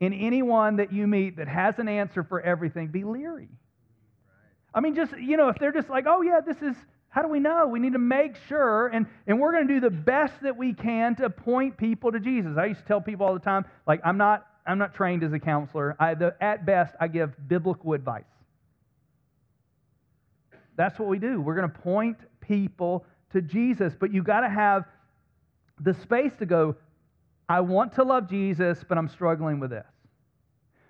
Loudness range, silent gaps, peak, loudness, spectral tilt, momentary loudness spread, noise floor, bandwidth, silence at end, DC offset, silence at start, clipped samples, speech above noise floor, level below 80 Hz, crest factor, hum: 6 LU; none; -8 dBFS; -26 LUFS; -9.5 dB/octave; 8 LU; -69 dBFS; 6.2 kHz; 1.05 s; under 0.1%; 0 s; under 0.1%; 45 dB; -66 dBFS; 18 dB; none